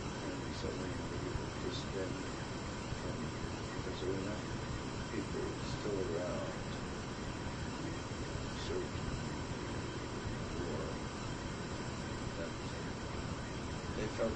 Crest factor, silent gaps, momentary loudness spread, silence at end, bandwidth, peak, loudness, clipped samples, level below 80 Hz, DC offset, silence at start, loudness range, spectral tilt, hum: 16 dB; none; 3 LU; 0 s; 9.8 kHz; -24 dBFS; -41 LUFS; under 0.1%; -50 dBFS; under 0.1%; 0 s; 2 LU; -5 dB/octave; none